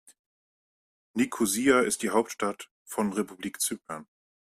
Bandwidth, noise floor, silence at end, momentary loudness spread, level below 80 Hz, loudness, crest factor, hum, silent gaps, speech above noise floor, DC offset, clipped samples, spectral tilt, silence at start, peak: 15.5 kHz; under -90 dBFS; 0.55 s; 15 LU; -68 dBFS; -28 LUFS; 22 dB; none; 2.71-2.85 s; over 62 dB; under 0.1%; under 0.1%; -3.5 dB/octave; 1.15 s; -8 dBFS